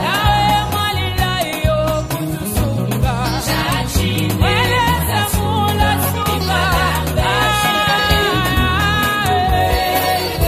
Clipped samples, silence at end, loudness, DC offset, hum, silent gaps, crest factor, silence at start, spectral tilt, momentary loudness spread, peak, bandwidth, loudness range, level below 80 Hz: under 0.1%; 0 s; -16 LUFS; under 0.1%; none; none; 14 dB; 0 s; -4.5 dB/octave; 4 LU; -2 dBFS; 15.5 kHz; 3 LU; -26 dBFS